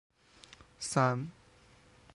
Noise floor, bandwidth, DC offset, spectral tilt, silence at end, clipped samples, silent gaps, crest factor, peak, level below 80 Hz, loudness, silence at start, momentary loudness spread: -61 dBFS; 11.5 kHz; under 0.1%; -5 dB/octave; 0.85 s; under 0.1%; none; 24 dB; -14 dBFS; -68 dBFS; -33 LUFS; 0.8 s; 25 LU